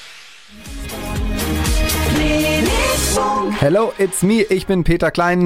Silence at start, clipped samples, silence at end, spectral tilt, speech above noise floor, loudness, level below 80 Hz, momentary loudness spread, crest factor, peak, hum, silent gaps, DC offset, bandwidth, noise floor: 0 s; under 0.1%; 0 s; -4.5 dB/octave; 25 dB; -17 LUFS; -26 dBFS; 12 LU; 16 dB; 0 dBFS; none; none; under 0.1%; 17 kHz; -40 dBFS